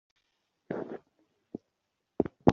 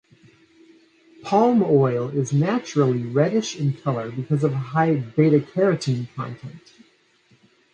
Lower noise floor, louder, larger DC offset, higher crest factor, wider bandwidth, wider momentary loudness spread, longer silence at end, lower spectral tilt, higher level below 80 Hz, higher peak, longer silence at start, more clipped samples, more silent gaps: first, -82 dBFS vs -60 dBFS; second, -34 LUFS vs -21 LUFS; neither; first, 30 dB vs 18 dB; second, 7.2 kHz vs 9.2 kHz; first, 16 LU vs 12 LU; second, 0 s vs 1.15 s; about the same, -7.5 dB/octave vs -7 dB/octave; first, -58 dBFS vs -64 dBFS; about the same, -4 dBFS vs -4 dBFS; second, 0.7 s vs 1.25 s; neither; neither